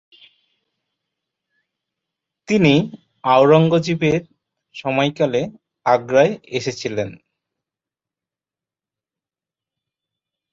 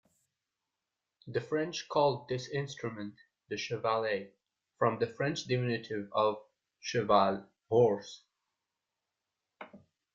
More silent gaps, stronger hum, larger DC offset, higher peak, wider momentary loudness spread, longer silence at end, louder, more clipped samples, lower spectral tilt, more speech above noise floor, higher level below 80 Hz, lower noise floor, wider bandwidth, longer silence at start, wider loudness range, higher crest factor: neither; neither; neither; first, -2 dBFS vs -12 dBFS; second, 14 LU vs 19 LU; first, 3.4 s vs 0.35 s; first, -18 LUFS vs -32 LUFS; neither; about the same, -6.5 dB/octave vs -5.5 dB/octave; first, 73 dB vs 57 dB; first, -58 dBFS vs -72 dBFS; about the same, -90 dBFS vs -89 dBFS; about the same, 7.8 kHz vs 7.6 kHz; first, 2.5 s vs 1.25 s; first, 13 LU vs 4 LU; about the same, 20 dB vs 22 dB